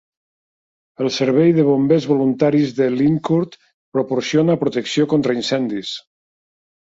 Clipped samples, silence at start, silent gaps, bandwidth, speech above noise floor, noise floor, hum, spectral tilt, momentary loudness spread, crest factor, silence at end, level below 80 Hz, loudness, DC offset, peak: under 0.1%; 1 s; 3.74-3.92 s; 7.8 kHz; over 73 dB; under -90 dBFS; none; -6.5 dB/octave; 10 LU; 16 dB; 0.85 s; -60 dBFS; -17 LUFS; under 0.1%; -2 dBFS